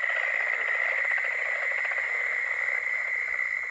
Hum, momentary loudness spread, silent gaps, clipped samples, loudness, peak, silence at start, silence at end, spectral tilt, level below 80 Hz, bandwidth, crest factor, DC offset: none; 2 LU; none; under 0.1%; -26 LUFS; -14 dBFS; 0 s; 0 s; 0 dB/octave; -70 dBFS; 8.8 kHz; 14 dB; under 0.1%